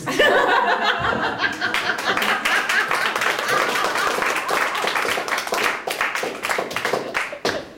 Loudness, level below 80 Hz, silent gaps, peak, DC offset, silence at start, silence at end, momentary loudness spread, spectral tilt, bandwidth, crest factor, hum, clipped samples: -20 LUFS; -54 dBFS; none; -6 dBFS; under 0.1%; 0 s; 0 s; 6 LU; -2 dB/octave; 17 kHz; 16 dB; none; under 0.1%